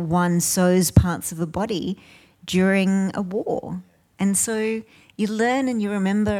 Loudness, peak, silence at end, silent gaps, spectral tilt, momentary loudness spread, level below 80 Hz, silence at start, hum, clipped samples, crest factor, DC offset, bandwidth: -22 LUFS; -4 dBFS; 0 s; none; -5 dB/octave; 11 LU; -42 dBFS; 0 s; none; under 0.1%; 18 dB; under 0.1%; 17.5 kHz